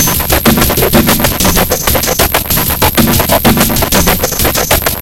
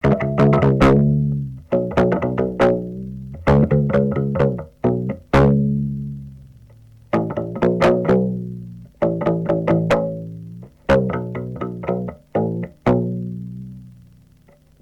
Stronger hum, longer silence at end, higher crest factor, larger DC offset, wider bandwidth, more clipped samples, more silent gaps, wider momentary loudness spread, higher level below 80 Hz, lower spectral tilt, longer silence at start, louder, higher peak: neither; second, 0 s vs 0.9 s; second, 10 dB vs 18 dB; neither; first, over 20 kHz vs 8.4 kHz; first, 0.9% vs under 0.1%; neither; second, 2 LU vs 16 LU; first, -20 dBFS vs -36 dBFS; second, -3.5 dB/octave vs -9 dB/octave; about the same, 0 s vs 0.05 s; first, -9 LUFS vs -19 LUFS; about the same, 0 dBFS vs -2 dBFS